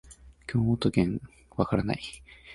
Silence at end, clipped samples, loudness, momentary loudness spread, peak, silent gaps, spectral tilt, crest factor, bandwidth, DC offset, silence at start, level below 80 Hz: 0 s; under 0.1%; -29 LUFS; 16 LU; -8 dBFS; none; -7 dB/octave; 22 dB; 11.5 kHz; under 0.1%; 0.1 s; -48 dBFS